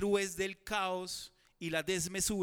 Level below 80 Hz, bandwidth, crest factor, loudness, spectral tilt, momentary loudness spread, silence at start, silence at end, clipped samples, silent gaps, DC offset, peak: -60 dBFS; 19.5 kHz; 18 dB; -36 LUFS; -3 dB/octave; 11 LU; 0 s; 0 s; under 0.1%; none; under 0.1%; -18 dBFS